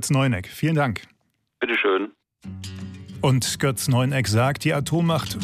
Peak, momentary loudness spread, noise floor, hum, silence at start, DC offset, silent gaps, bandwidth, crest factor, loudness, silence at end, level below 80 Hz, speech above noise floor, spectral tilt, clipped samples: -8 dBFS; 15 LU; -50 dBFS; none; 0 s; under 0.1%; none; 15.5 kHz; 14 dB; -22 LUFS; 0 s; -52 dBFS; 29 dB; -5 dB/octave; under 0.1%